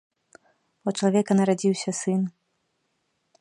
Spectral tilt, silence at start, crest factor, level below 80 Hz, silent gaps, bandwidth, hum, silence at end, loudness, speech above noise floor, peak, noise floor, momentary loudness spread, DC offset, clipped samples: -6 dB/octave; 0.85 s; 18 dB; -74 dBFS; none; 11 kHz; none; 1.1 s; -24 LUFS; 51 dB; -8 dBFS; -74 dBFS; 10 LU; under 0.1%; under 0.1%